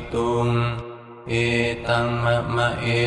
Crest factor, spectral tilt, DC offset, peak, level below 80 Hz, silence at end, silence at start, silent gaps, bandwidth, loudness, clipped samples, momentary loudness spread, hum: 16 dB; -6 dB/octave; under 0.1%; -6 dBFS; -42 dBFS; 0 s; 0 s; none; 10.5 kHz; -22 LUFS; under 0.1%; 8 LU; none